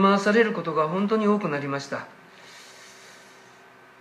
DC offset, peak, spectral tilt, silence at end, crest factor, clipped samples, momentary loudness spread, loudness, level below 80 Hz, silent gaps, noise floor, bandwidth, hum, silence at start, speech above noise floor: under 0.1%; -6 dBFS; -6 dB/octave; 0.9 s; 20 dB; under 0.1%; 25 LU; -24 LUFS; -78 dBFS; none; -51 dBFS; 11 kHz; none; 0 s; 28 dB